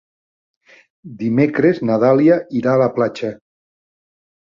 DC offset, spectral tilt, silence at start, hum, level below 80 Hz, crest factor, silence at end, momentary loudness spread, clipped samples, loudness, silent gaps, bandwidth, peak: under 0.1%; -8.5 dB/octave; 1.05 s; none; -60 dBFS; 16 dB; 1.15 s; 11 LU; under 0.1%; -16 LUFS; none; 7.2 kHz; -2 dBFS